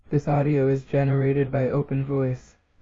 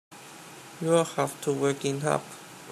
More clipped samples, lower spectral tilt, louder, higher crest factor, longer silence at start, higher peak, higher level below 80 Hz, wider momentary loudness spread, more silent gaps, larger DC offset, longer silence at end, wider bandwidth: neither; first, -10 dB/octave vs -5 dB/octave; first, -23 LUFS vs -28 LUFS; second, 12 dB vs 20 dB; about the same, 0.1 s vs 0.1 s; about the same, -10 dBFS vs -10 dBFS; first, -50 dBFS vs -74 dBFS; second, 4 LU vs 20 LU; neither; neither; first, 0.4 s vs 0 s; second, 7.2 kHz vs 15 kHz